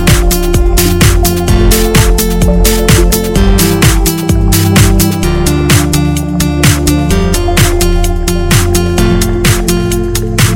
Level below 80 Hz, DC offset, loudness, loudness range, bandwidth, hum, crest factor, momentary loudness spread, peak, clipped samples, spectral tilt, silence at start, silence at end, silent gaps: -12 dBFS; under 0.1%; -9 LUFS; 2 LU; 17.5 kHz; none; 8 dB; 4 LU; 0 dBFS; 0.6%; -4.5 dB/octave; 0 s; 0 s; none